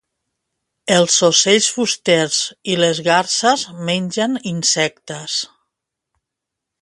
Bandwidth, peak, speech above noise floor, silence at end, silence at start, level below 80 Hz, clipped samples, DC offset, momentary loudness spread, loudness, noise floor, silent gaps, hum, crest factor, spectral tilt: 11.5 kHz; 0 dBFS; 65 dB; 1.35 s; 0.85 s; -64 dBFS; under 0.1%; under 0.1%; 10 LU; -16 LUFS; -81 dBFS; none; none; 18 dB; -2.5 dB/octave